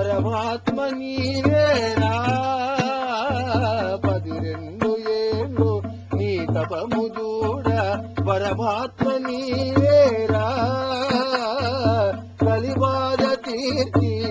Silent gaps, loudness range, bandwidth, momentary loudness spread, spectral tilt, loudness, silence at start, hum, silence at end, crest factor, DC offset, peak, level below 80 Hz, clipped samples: none; 3 LU; 8 kHz; 7 LU; -7 dB/octave; -22 LUFS; 0 s; none; 0 s; 16 dB; under 0.1%; -4 dBFS; -40 dBFS; under 0.1%